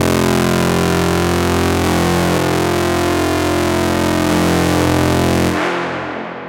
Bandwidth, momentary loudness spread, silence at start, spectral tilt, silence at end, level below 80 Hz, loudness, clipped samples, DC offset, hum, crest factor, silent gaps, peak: 17 kHz; 2 LU; 0 s; -5 dB/octave; 0 s; -34 dBFS; -15 LUFS; under 0.1%; under 0.1%; none; 14 dB; none; 0 dBFS